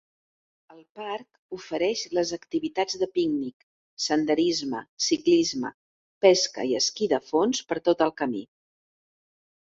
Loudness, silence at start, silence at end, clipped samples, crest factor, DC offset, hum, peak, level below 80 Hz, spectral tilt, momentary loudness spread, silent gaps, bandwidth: -25 LUFS; 0.75 s; 1.3 s; under 0.1%; 20 dB; under 0.1%; none; -6 dBFS; -68 dBFS; -3 dB/octave; 14 LU; 0.90-0.95 s, 1.39-1.49 s, 3.53-3.97 s, 4.89-4.97 s, 5.74-6.21 s; 7.8 kHz